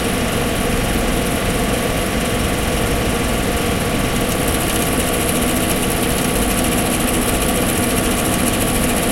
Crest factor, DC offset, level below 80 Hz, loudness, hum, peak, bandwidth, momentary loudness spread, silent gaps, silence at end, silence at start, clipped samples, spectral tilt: 14 dB; under 0.1%; -26 dBFS; -17 LUFS; none; -2 dBFS; 17 kHz; 2 LU; none; 0 s; 0 s; under 0.1%; -4 dB/octave